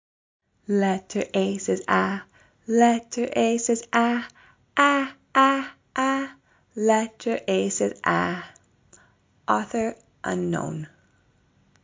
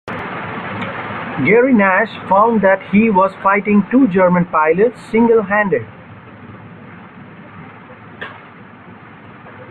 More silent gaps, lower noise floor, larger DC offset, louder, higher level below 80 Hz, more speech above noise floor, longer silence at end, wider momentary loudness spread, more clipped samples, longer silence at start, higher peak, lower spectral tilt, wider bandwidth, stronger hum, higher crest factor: neither; first, -63 dBFS vs -38 dBFS; neither; second, -24 LUFS vs -14 LUFS; second, -64 dBFS vs -54 dBFS; first, 40 dB vs 25 dB; first, 0.95 s vs 0 s; second, 15 LU vs 20 LU; neither; first, 0.7 s vs 0.05 s; about the same, -4 dBFS vs -2 dBFS; second, -4.5 dB/octave vs -9 dB/octave; first, 7.8 kHz vs 4.6 kHz; neither; first, 20 dB vs 14 dB